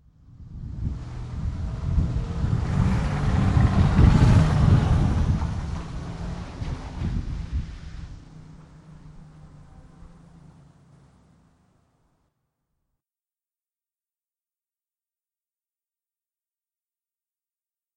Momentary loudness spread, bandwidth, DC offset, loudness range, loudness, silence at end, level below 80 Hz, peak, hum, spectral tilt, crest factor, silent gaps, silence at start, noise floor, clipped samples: 20 LU; 10.5 kHz; under 0.1%; 16 LU; -24 LUFS; 8.35 s; -32 dBFS; -6 dBFS; none; -8 dB/octave; 20 dB; none; 0.4 s; under -90 dBFS; under 0.1%